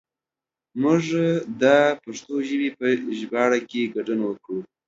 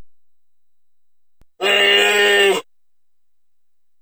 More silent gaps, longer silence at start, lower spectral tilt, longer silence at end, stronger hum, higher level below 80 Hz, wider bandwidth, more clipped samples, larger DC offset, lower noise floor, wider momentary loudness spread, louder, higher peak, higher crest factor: neither; first, 0.75 s vs 0 s; first, -6 dB/octave vs -1 dB/octave; second, 0.25 s vs 1.4 s; neither; about the same, -70 dBFS vs -68 dBFS; second, 7.8 kHz vs over 20 kHz; neither; second, under 0.1% vs 0.3%; first, -90 dBFS vs -83 dBFS; first, 12 LU vs 9 LU; second, -23 LUFS vs -14 LUFS; about the same, -4 dBFS vs -4 dBFS; about the same, 20 dB vs 16 dB